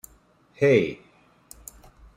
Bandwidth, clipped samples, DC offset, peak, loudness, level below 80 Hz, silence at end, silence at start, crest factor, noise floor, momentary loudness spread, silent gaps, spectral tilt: 16 kHz; under 0.1%; under 0.1%; -6 dBFS; -22 LUFS; -58 dBFS; 1.2 s; 0.6 s; 22 dB; -59 dBFS; 24 LU; none; -6 dB/octave